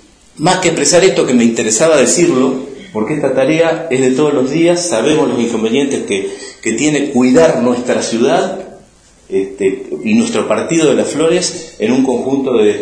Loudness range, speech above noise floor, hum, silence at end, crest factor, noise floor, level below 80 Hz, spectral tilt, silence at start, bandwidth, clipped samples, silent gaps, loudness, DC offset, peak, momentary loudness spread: 3 LU; 32 dB; none; 0 s; 12 dB; -44 dBFS; -52 dBFS; -4 dB/octave; 0.4 s; 10.5 kHz; under 0.1%; none; -12 LUFS; under 0.1%; 0 dBFS; 10 LU